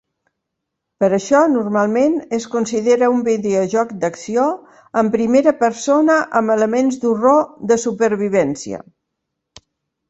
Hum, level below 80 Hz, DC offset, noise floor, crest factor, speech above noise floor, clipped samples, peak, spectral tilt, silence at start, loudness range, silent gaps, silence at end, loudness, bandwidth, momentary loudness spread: none; -60 dBFS; under 0.1%; -78 dBFS; 16 dB; 62 dB; under 0.1%; -2 dBFS; -5.5 dB/octave; 1 s; 2 LU; none; 1.3 s; -16 LUFS; 8.2 kHz; 8 LU